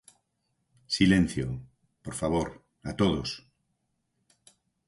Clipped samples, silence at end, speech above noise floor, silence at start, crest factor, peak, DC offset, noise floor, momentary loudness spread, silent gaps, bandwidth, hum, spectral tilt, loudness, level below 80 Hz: under 0.1%; 1.5 s; 51 dB; 0.9 s; 22 dB; -8 dBFS; under 0.1%; -78 dBFS; 19 LU; none; 11.5 kHz; none; -5.5 dB/octave; -28 LUFS; -48 dBFS